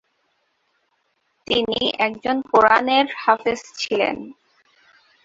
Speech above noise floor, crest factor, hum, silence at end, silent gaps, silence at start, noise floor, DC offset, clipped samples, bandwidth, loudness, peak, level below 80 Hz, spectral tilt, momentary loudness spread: 49 dB; 22 dB; none; 0.9 s; none; 1.5 s; -69 dBFS; under 0.1%; under 0.1%; 7.8 kHz; -19 LUFS; 0 dBFS; -58 dBFS; -3.5 dB/octave; 11 LU